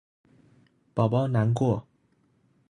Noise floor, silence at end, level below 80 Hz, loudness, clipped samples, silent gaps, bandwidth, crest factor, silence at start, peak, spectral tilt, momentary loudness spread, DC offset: -67 dBFS; 0.9 s; -60 dBFS; -26 LUFS; under 0.1%; none; 10.5 kHz; 20 dB; 0.95 s; -8 dBFS; -8.5 dB/octave; 8 LU; under 0.1%